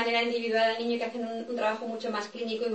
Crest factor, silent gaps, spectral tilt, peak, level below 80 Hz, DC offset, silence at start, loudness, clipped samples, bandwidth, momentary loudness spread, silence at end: 16 dB; none; -4 dB/octave; -14 dBFS; -80 dBFS; under 0.1%; 0 s; -30 LUFS; under 0.1%; 8.6 kHz; 8 LU; 0 s